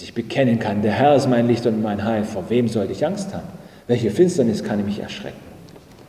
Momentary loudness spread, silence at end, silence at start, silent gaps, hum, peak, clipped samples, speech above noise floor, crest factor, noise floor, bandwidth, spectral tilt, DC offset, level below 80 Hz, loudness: 16 LU; 0.05 s; 0 s; none; none; -4 dBFS; under 0.1%; 24 dB; 16 dB; -43 dBFS; 14.5 kHz; -6.5 dB/octave; under 0.1%; -50 dBFS; -20 LUFS